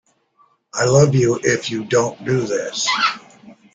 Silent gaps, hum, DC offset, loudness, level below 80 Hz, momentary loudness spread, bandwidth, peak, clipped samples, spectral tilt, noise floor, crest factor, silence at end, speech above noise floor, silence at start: none; none; under 0.1%; -18 LUFS; -54 dBFS; 8 LU; 9.4 kHz; -2 dBFS; under 0.1%; -4.5 dB/octave; -59 dBFS; 18 dB; 0.2 s; 41 dB; 0.75 s